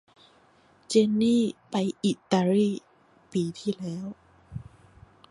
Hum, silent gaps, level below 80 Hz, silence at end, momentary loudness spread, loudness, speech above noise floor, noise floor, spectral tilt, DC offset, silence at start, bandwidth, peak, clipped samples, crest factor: none; none; -62 dBFS; 0.7 s; 19 LU; -26 LUFS; 35 dB; -60 dBFS; -6 dB/octave; under 0.1%; 0.9 s; 11.5 kHz; -8 dBFS; under 0.1%; 20 dB